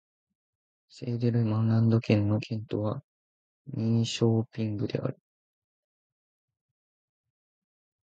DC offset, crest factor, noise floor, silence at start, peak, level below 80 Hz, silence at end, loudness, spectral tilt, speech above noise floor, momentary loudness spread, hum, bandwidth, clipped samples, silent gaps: under 0.1%; 22 dB; under -90 dBFS; 0.95 s; -8 dBFS; -60 dBFS; 2.95 s; -28 LUFS; -7.5 dB/octave; over 63 dB; 11 LU; none; 8 kHz; under 0.1%; 3.04-3.65 s